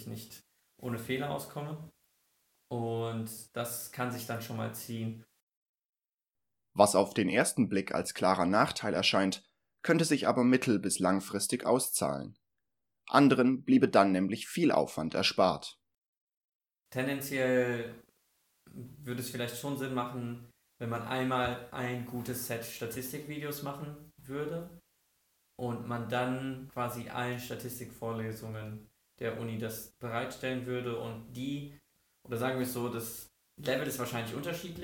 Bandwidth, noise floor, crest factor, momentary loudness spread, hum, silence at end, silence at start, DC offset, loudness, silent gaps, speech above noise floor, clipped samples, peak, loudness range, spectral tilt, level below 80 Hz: 19 kHz; -90 dBFS; 26 dB; 15 LU; none; 0 s; 0 s; under 0.1%; -32 LUFS; 5.43-5.47 s, 5.57-5.74 s, 5.85-5.93 s, 6.14-6.18 s, 15.98-16.02 s, 16.08-16.27 s, 16.37-16.41 s, 16.49-16.60 s; 58 dB; under 0.1%; -8 dBFS; 11 LU; -4.5 dB/octave; -68 dBFS